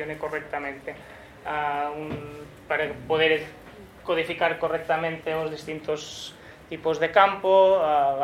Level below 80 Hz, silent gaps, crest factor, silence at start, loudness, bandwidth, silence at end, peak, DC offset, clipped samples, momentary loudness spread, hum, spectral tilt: -58 dBFS; none; 22 dB; 0 s; -25 LUFS; 14.5 kHz; 0 s; -2 dBFS; under 0.1%; under 0.1%; 20 LU; none; -4.5 dB/octave